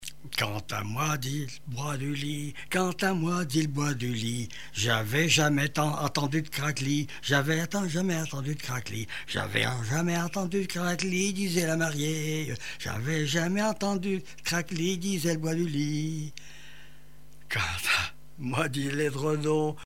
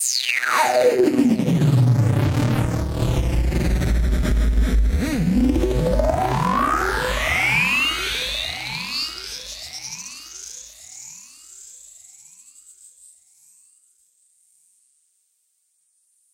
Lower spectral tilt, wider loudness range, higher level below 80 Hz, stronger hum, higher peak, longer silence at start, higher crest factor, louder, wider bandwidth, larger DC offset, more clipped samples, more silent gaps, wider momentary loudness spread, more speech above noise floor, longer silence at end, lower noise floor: about the same, -4.5 dB/octave vs -5 dB/octave; second, 4 LU vs 18 LU; second, -58 dBFS vs -28 dBFS; neither; about the same, -8 dBFS vs -6 dBFS; about the same, 0 s vs 0 s; about the same, 20 dB vs 16 dB; second, -29 LUFS vs -20 LUFS; about the same, 16 kHz vs 17 kHz; first, 0.8% vs under 0.1%; neither; neither; second, 8 LU vs 20 LU; second, 26 dB vs 50 dB; second, 0 s vs 4.55 s; second, -55 dBFS vs -68 dBFS